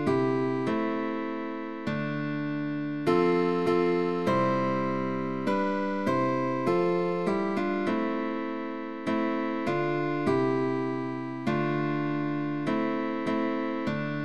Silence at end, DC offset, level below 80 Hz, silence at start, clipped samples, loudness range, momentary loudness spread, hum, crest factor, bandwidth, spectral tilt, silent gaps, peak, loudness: 0 s; 0.4%; -66 dBFS; 0 s; under 0.1%; 2 LU; 6 LU; none; 14 dB; 11.5 kHz; -7.5 dB/octave; none; -14 dBFS; -28 LUFS